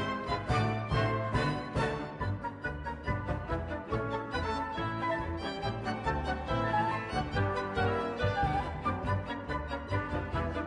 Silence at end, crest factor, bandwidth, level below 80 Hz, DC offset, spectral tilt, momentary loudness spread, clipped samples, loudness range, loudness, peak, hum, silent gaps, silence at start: 0 s; 16 dB; 10.5 kHz; -44 dBFS; under 0.1%; -7 dB/octave; 6 LU; under 0.1%; 3 LU; -33 LUFS; -16 dBFS; none; none; 0 s